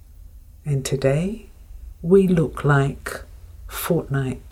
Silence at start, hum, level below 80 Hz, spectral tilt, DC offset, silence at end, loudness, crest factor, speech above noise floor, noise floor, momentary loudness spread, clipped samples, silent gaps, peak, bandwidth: 0.1 s; none; -40 dBFS; -7 dB/octave; under 0.1%; 0 s; -21 LUFS; 18 dB; 23 dB; -43 dBFS; 17 LU; under 0.1%; none; -4 dBFS; 16 kHz